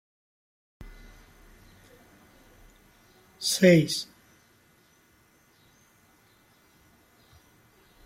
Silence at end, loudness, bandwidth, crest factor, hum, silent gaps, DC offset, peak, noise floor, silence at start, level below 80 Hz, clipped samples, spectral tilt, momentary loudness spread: 4 s; -23 LUFS; 16.5 kHz; 24 dB; none; none; under 0.1%; -8 dBFS; -62 dBFS; 0.8 s; -60 dBFS; under 0.1%; -5 dB/octave; 30 LU